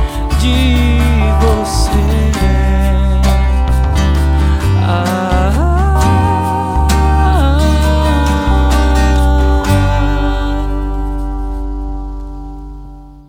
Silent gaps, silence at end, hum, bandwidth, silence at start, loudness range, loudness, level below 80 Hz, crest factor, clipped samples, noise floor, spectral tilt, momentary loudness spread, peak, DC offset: none; 0.05 s; none; 15 kHz; 0 s; 4 LU; -13 LUFS; -14 dBFS; 12 dB; under 0.1%; -31 dBFS; -6.5 dB/octave; 11 LU; 0 dBFS; under 0.1%